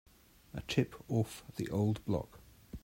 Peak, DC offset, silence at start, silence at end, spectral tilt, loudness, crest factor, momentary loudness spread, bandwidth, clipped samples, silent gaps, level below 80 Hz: -16 dBFS; under 0.1%; 0.55 s; 0.05 s; -6.5 dB/octave; -36 LUFS; 22 dB; 14 LU; 16 kHz; under 0.1%; none; -58 dBFS